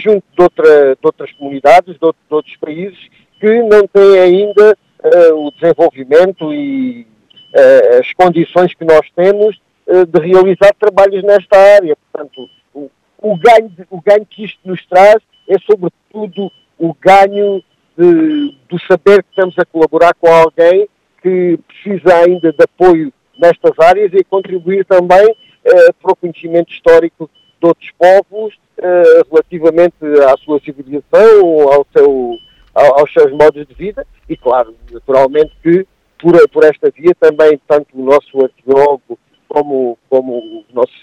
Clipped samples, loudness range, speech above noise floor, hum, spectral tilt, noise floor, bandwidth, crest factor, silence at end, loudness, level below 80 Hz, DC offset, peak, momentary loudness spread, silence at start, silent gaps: 2%; 3 LU; 22 dB; none; -6.5 dB/octave; -31 dBFS; 10.5 kHz; 10 dB; 0.15 s; -9 LUFS; -46 dBFS; under 0.1%; 0 dBFS; 16 LU; 0 s; none